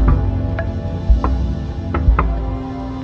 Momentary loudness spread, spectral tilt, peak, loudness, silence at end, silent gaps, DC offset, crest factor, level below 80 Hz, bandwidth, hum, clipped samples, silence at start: 8 LU; -9 dB/octave; 0 dBFS; -20 LUFS; 0 s; none; under 0.1%; 16 dB; -18 dBFS; 5.8 kHz; none; under 0.1%; 0 s